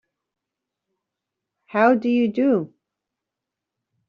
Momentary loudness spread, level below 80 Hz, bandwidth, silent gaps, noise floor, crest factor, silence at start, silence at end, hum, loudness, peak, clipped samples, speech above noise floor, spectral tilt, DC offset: 10 LU; -72 dBFS; 6.2 kHz; none; -85 dBFS; 22 dB; 1.75 s; 1.4 s; none; -20 LUFS; -4 dBFS; under 0.1%; 66 dB; -5.5 dB/octave; under 0.1%